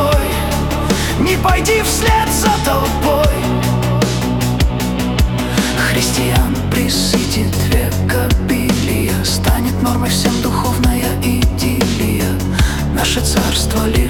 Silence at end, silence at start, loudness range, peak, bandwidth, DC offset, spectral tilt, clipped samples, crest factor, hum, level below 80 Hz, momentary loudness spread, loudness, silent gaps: 0 s; 0 s; 1 LU; -2 dBFS; 18 kHz; under 0.1%; -4.5 dB/octave; under 0.1%; 12 dB; none; -22 dBFS; 3 LU; -15 LUFS; none